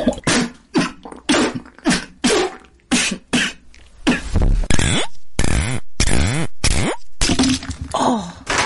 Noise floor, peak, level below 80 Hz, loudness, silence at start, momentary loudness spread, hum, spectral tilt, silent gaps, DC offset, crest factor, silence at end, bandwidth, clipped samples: -41 dBFS; -2 dBFS; -26 dBFS; -19 LUFS; 0 s; 6 LU; none; -3.5 dB/octave; none; under 0.1%; 16 dB; 0 s; 11.5 kHz; under 0.1%